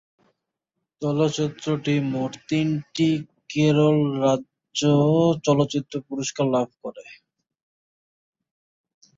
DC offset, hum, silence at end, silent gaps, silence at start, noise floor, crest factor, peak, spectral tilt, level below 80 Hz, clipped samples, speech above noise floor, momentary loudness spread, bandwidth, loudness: under 0.1%; none; 2.05 s; none; 1 s; -82 dBFS; 18 dB; -6 dBFS; -6 dB/octave; -64 dBFS; under 0.1%; 60 dB; 12 LU; 7.8 kHz; -23 LUFS